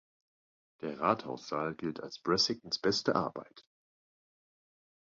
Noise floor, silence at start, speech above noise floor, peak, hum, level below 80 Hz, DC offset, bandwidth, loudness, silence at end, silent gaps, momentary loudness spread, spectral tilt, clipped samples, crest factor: under -90 dBFS; 0.8 s; over 56 dB; -12 dBFS; none; -70 dBFS; under 0.1%; 7.4 kHz; -33 LUFS; 1.5 s; none; 11 LU; -3 dB/octave; under 0.1%; 24 dB